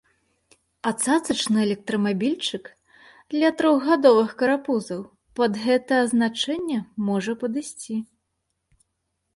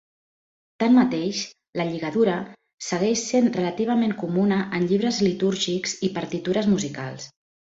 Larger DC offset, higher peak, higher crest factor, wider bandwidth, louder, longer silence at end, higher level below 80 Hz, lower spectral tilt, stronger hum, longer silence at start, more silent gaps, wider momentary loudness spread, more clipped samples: neither; first, -4 dBFS vs -8 dBFS; about the same, 20 dB vs 16 dB; first, 11.5 kHz vs 8 kHz; about the same, -23 LUFS vs -23 LUFS; first, 1.3 s vs 0.5 s; about the same, -66 dBFS vs -62 dBFS; about the same, -4.5 dB/octave vs -5 dB/octave; neither; about the same, 0.85 s vs 0.8 s; second, none vs 1.69-1.73 s, 2.74-2.78 s; about the same, 13 LU vs 11 LU; neither